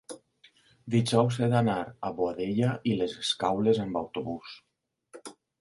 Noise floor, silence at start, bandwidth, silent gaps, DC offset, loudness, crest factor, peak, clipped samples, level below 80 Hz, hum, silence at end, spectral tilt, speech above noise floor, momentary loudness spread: -68 dBFS; 0.1 s; 11.5 kHz; none; under 0.1%; -28 LUFS; 20 dB; -8 dBFS; under 0.1%; -62 dBFS; none; 0.3 s; -6 dB/octave; 40 dB; 21 LU